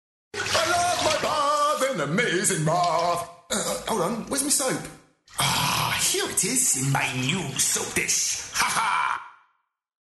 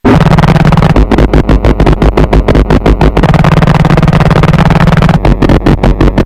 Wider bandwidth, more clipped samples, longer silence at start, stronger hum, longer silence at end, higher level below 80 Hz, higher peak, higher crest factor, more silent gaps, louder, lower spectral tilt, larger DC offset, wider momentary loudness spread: about the same, 12.5 kHz vs 11.5 kHz; second, under 0.1% vs 4%; first, 0.35 s vs 0.05 s; neither; first, 0.75 s vs 0 s; second, -56 dBFS vs -10 dBFS; second, -10 dBFS vs 0 dBFS; first, 14 dB vs 6 dB; neither; second, -23 LUFS vs -7 LUFS; second, -2.5 dB/octave vs -8 dB/octave; neither; first, 6 LU vs 2 LU